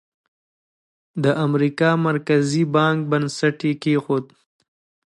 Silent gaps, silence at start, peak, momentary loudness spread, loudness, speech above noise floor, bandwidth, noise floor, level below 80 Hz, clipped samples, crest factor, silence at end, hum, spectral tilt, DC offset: none; 1.15 s; -4 dBFS; 5 LU; -20 LUFS; over 71 dB; 11.5 kHz; under -90 dBFS; -68 dBFS; under 0.1%; 18 dB; 0.9 s; none; -6.5 dB/octave; under 0.1%